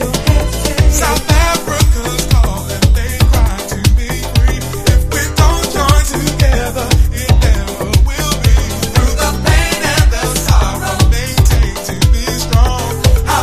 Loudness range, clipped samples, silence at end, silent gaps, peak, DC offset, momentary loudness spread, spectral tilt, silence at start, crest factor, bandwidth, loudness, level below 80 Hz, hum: 1 LU; 0.3%; 0 s; none; 0 dBFS; under 0.1%; 4 LU; -4.5 dB/octave; 0 s; 12 dB; 15.5 kHz; -13 LUFS; -14 dBFS; none